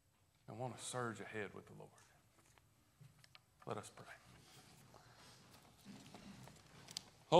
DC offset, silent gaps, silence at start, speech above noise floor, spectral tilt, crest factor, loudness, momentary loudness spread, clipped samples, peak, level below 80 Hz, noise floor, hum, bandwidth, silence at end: under 0.1%; none; 0.5 s; 23 dB; -4.5 dB/octave; 30 dB; -52 LUFS; 21 LU; under 0.1%; -16 dBFS; -80 dBFS; -72 dBFS; none; 15.5 kHz; 0 s